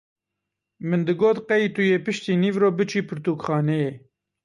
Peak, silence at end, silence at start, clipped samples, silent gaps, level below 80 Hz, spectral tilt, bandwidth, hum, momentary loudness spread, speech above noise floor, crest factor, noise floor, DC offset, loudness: -8 dBFS; 0.45 s; 0.8 s; under 0.1%; none; -66 dBFS; -7 dB/octave; 11 kHz; none; 7 LU; 62 dB; 14 dB; -83 dBFS; under 0.1%; -22 LUFS